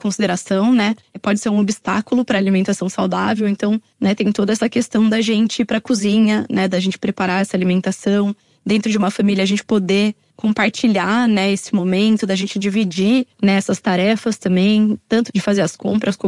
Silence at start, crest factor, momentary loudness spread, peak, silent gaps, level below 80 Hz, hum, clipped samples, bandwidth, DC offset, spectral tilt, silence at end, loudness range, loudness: 0.05 s; 14 dB; 5 LU; -2 dBFS; none; -58 dBFS; none; under 0.1%; 11.5 kHz; under 0.1%; -5.5 dB/octave; 0 s; 1 LU; -17 LUFS